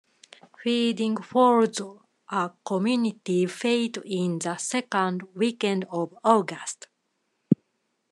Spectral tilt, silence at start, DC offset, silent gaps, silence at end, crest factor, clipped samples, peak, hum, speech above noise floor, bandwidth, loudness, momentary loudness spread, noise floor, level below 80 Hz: -5 dB/octave; 0.6 s; under 0.1%; none; 0.55 s; 22 dB; under 0.1%; -4 dBFS; none; 50 dB; 12 kHz; -26 LUFS; 10 LU; -75 dBFS; -82 dBFS